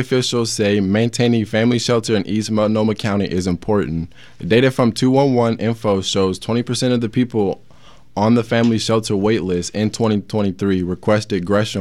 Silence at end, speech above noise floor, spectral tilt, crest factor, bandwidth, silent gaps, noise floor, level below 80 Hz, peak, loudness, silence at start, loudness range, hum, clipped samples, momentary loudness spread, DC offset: 0 s; 31 dB; -5.5 dB/octave; 16 dB; 13 kHz; none; -48 dBFS; -50 dBFS; -2 dBFS; -18 LUFS; 0 s; 1 LU; none; under 0.1%; 6 LU; 0.4%